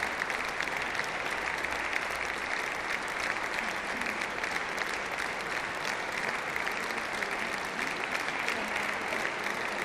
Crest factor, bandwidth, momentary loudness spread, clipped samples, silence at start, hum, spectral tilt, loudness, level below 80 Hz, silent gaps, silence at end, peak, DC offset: 20 dB; 15.5 kHz; 2 LU; under 0.1%; 0 s; none; -2 dB/octave; -32 LUFS; -60 dBFS; none; 0 s; -12 dBFS; under 0.1%